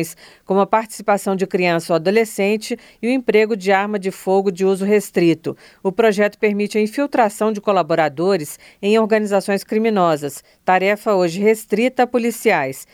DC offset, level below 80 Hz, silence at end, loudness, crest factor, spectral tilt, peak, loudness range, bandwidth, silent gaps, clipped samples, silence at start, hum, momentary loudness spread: under 0.1%; -64 dBFS; 0.1 s; -18 LUFS; 16 dB; -5.5 dB/octave; 0 dBFS; 1 LU; 17 kHz; none; under 0.1%; 0 s; none; 7 LU